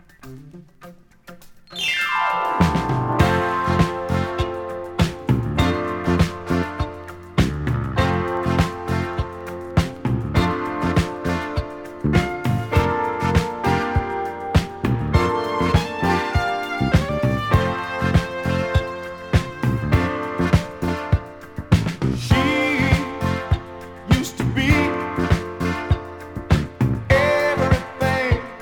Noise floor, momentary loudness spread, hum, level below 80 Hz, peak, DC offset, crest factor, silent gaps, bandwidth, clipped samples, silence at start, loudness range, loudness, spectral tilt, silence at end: -45 dBFS; 8 LU; none; -32 dBFS; -2 dBFS; under 0.1%; 20 dB; none; 18.5 kHz; under 0.1%; 0.25 s; 2 LU; -21 LUFS; -6.5 dB/octave; 0 s